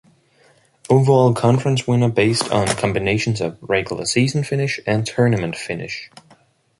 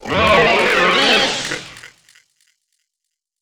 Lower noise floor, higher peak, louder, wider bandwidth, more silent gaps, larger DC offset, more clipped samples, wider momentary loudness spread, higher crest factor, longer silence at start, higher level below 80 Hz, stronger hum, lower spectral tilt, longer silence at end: second, -55 dBFS vs -79 dBFS; about the same, -2 dBFS vs 0 dBFS; second, -18 LUFS vs -13 LUFS; second, 11.5 kHz vs over 20 kHz; neither; neither; neither; second, 10 LU vs 14 LU; about the same, 18 dB vs 18 dB; first, 0.9 s vs 0 s; about the same, -48 dBFS vs -44 dBFS; neither; first, -5.5 dB/octave vs -3 dB/octave; second, 0.75 s vs 1.55 s